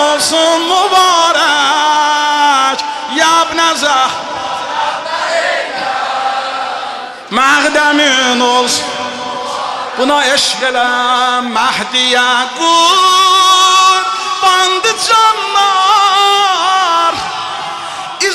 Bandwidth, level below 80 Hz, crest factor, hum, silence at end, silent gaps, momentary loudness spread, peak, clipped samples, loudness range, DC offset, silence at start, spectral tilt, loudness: 15.5 kHz; -54 dBFS; 12 dB; none; 0 s; none; 11 LU; 0 dBFS; under 0.1%; 5 LU; under 0.1%; 0 s; -0.5 dB/octave; -10 LUFS